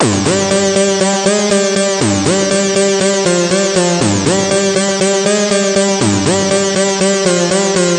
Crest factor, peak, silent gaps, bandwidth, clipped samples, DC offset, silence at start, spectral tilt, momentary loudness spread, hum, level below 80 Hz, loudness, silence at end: 12 dB; -2 dBFS; none; 11.5 kHz; under 0.1%; under 0.1%; 0 s; -3.5 dB/octave; 1 LU; none; -48 dBFS; -12 LUFS; 0 s